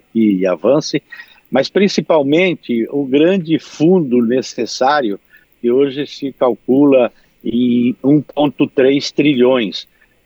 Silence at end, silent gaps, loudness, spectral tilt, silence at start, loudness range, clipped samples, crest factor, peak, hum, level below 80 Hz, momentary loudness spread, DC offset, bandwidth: 0.4 s; none; -15 LUFS; -6 dB/octave; 0.15 s; 2 LU; under 0.1%; 14 dB; -2 dBFS; none; -60 dBFS; 10 LU; under 0.1%; 7.6 kHz